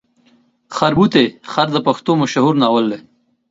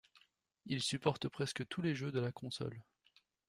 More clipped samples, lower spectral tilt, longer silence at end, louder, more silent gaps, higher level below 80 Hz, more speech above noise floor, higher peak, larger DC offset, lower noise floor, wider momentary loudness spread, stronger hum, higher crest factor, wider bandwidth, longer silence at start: neither; about the same, -6 dB/octave vs -5 dB/octave; second, 0.5 s vs 0.65 s; first, -15 LUFS vs -39 LUFS; neither; first, -52 dBFS vs -72 dBFS; first, 41 dB vs 34 dB; first, 0 dBFS vs -18 dBFS; neither; second, -55 dBFS vs -74 dBFS; about the same, 8 LU vs 9 LU; neither; second, 16 dB vs 24 dB; second, 7.8 kHz vs 15.5 kHz; first, 0.7 s vs 0.15 s